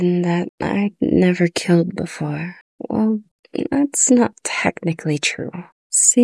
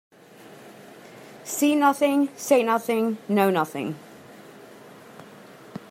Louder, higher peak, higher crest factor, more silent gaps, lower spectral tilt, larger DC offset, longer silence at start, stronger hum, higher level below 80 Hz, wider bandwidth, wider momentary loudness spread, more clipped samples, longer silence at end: first, -19 LUFS vs -23 LUFS; first, 0 dBFS vs -6 dBFS; about the same, 18 dB vs 20 dB; first, 0.49-0.58 s, 2.61-2.78 s, 3.31-3.43 s, 5.72-5.90 s vs none; about the same, -4.5 dB/octave vs -4.5 dB/octave; neither; second, 0 s vs 0.5 s; neither; first, -54 dBFS vs -76 dBFS; second, 12 kHz vs 16 kHz; second, 14 LU vs 25 LU; neither; about the same, 0 s vs 0.1 s